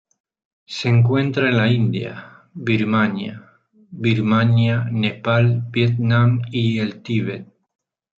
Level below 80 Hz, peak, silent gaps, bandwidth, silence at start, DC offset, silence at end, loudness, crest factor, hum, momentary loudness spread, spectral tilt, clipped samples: -60 dBFS; -4 dBFS; none; 7 kHz; 0.7 s; under 0.1%; 0.75 s; -19 LUFS; 14 dB; none; 12 LU; -8 dB/octave; under 0.1%